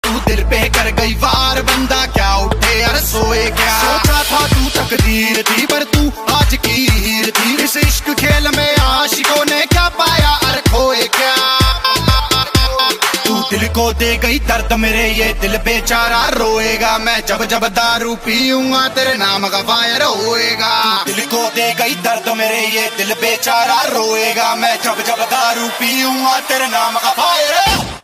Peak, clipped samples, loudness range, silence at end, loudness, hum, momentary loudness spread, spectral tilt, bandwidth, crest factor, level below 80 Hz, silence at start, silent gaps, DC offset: 0 dBFS; under 0.1%; 2 LU; 0.05 s; -13 LUFS; none; 3 LU; -3 dB/octave; 15.5 kHz; 14 dB; -22 dBFS; 0.05 s; none; under 0.1%